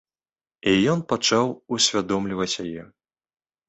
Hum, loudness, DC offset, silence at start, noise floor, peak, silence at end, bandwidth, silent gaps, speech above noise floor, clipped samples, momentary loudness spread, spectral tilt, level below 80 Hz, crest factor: none; -22 LUFS; under 0.1%; 0.65 s; under -90 dBFS; -6 dBFS; 0.85 s; 8.2 kHz; none; over 67 dB; under 0.1%; 9 LU; -3.5 dB/octave; -56 dBFS; 20 dB